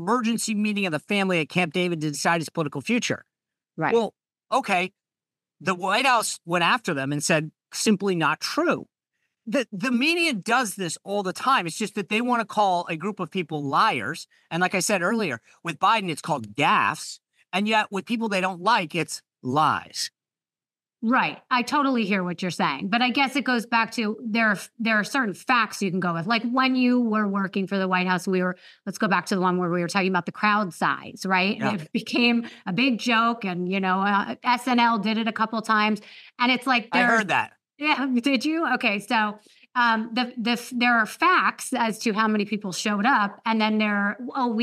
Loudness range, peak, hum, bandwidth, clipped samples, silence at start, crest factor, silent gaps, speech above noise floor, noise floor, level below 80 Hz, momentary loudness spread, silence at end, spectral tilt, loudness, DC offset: 3 LU; -6 dBFS; none; 15 kHz; under 0.1%; 0 s; 18 dB; none; over 66 dB; under -90 dBFS; -80 dBFS; 8 LU; 0 s; -4 dB/octave; -23 LUFS; under 0.1%